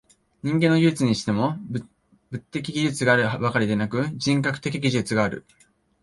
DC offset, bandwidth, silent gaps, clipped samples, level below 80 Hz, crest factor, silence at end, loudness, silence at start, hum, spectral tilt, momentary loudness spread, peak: under 0.1%; 11.5 kHz; none; under 0.1%; -56 dBFS; 20 dB; 0.6 s; -23 LUFS; 0.45 s; none; -5.5 dB/octave; 13 LU; -4 dBFS